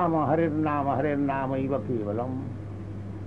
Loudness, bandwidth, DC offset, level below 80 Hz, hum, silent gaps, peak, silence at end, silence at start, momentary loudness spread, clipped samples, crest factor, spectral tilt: -28 LUFS; 6.8 kHz; 0.3%; -52 dBFS; none; none; -12 dBFS; 0 s; 0 s; 13 LU; under 0.1%; 14 dB; -10 dB/octave